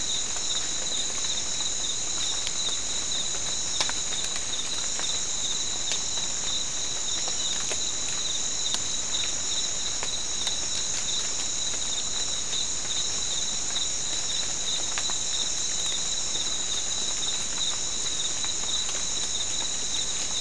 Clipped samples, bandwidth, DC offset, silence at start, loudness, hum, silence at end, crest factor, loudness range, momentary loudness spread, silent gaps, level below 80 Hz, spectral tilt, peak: under 0.1%; 12 kHz; 2%; 0 s; -26 LUFS; none; 0 s; 24 dB; 1 LU; 1 LU; none; -50 dBFS; 0.5 dB/octave; -6 dBFS